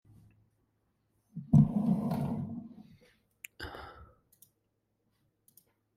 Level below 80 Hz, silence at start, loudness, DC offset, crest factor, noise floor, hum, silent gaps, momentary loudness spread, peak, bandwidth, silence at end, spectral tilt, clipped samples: -58 dBFS; 1.35 s; -30 LUFS; under 0.1%; 24 dB; -79 dBFS; none; none; 25 LU; -12 dBFS; 15.5 kHz; 1.95 s; -8.5 dB/octave; under 0.1%